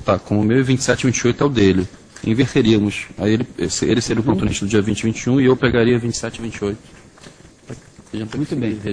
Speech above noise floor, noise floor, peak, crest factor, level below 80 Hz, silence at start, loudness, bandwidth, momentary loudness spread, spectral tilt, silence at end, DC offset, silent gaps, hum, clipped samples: 26 dB; -43 dBFS; 0 dBFS; 18 dB; -42 dBFS; 0 s; -18 LUFS; 10.5 kHz; 12 LU; -5.5 dB/octave; 0 s; under 0.1%; none; none; under 0.1%